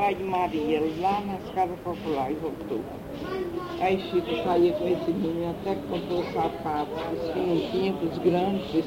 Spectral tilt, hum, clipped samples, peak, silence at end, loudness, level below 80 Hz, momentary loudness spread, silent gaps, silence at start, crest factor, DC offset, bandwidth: -7 dB/octave; none; under 0.1%; -10 dBFS; 0 s; -28 LUFS; -52 dBFS; 8 LU; none; 0 s; 16 dB; under 0.1%; 16 kHz